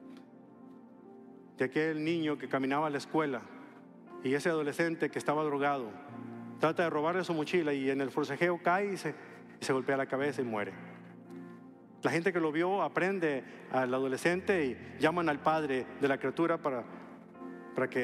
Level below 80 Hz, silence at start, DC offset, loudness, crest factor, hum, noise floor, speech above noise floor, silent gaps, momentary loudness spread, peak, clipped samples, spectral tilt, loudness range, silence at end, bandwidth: -78 dBFS; 0 s; under 0.1%; -32 LUFS; 18 dB; none; -54 dBFS; 22 dB; none; 18 LU; -14 dBFS; under 0.1%; -6 dB/octave; 3 LU; 0 s; 14 kHz